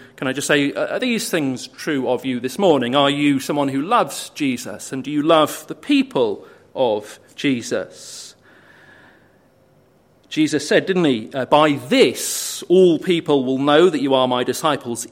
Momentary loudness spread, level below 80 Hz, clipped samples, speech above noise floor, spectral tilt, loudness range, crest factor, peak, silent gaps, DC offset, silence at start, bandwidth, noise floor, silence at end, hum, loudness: 12 LU; -66 dBFS; under 0.1%; 37 dB; -4.5 dB/octave; 10 LU; 18 dB; 0 dBFS; none; under 0.1%; 0 s; 16.5 kHz; -55 dBFS; 0.05 s; none; -18 LUFS